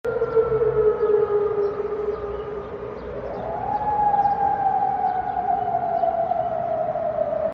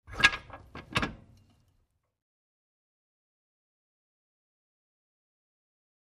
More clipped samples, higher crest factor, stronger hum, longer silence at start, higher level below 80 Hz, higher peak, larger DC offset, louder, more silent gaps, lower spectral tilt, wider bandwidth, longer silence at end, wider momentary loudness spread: neither; second, 14 dB vs 34 dB; neither; about the same, 0.05 s vs 0.1 s; first, -48 dBFS vs -56 dBFS; second, -8 dBFS vs -4 dBFS; neither; first, -23 LUFS vs -29 LUFS; neither; first, -8.5 dB/octave vs -2.5 dB/octave; second, 5.6 kHz vs 14.5 kHz; second, 0 s vs 4.9 s; second, 11 LU vs 23 LU